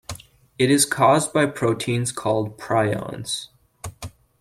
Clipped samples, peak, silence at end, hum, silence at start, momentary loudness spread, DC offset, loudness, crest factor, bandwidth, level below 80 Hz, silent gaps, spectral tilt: under 0.1%; -4 dBFS; 0.3 s; none; 0.1 s; 22 LU; under 0.1%; -21 LUFS; 18 dB; 16 kHz; -54 dBFS; none; -4.5 dB/octave